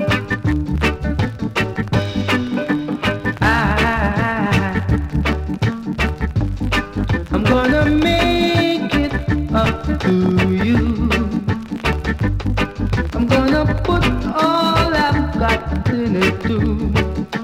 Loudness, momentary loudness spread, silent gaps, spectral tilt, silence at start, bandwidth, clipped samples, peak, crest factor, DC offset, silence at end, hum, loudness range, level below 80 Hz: -18 LUFS; 6 LU; none; -6.5 dB/octave; 0 s; 16 kHz; under 0.1%; -2 dBFS; 14 dB; under 0.1%; 0 s; none; 3 LU; -26 dBFS